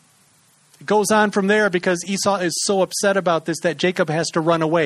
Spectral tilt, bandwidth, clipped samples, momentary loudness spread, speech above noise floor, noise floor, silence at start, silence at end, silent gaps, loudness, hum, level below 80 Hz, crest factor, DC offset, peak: -4 dB/octave; 13.5 kHz; under 0.1%; 4 LU; 38 dB; -56 dBFS; 0.8 s; 0 s; none; -19 LUFS; none; -64 dBFS; 18 dB; under 0.1%; -2 dBFS